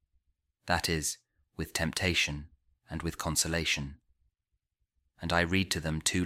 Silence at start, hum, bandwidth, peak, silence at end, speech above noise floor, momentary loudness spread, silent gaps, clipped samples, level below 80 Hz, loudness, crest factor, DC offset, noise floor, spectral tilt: 0.65 s; none; 16 kHz; -12 dBFS; 0 s; 52 dB; 15 LU; none; under 0.1%; -50 dBFS; -30 LUFS; 22 dB; under 0.1%; -83 dBFS; -3 dB/octave